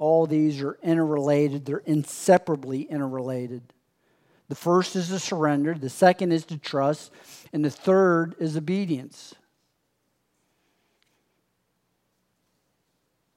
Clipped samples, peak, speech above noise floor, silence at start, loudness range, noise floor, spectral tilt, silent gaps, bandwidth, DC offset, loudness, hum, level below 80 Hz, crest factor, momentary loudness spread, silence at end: under 0.1%; -2 dBFS; 50 dB; 0 s; 5 LU; -74 dBFS; -6 dB/octave; none; 16 kHz; under 0.1%; -24 LUFS; none; -80 dBFS; 22 dB; 11 LU; 4.1 s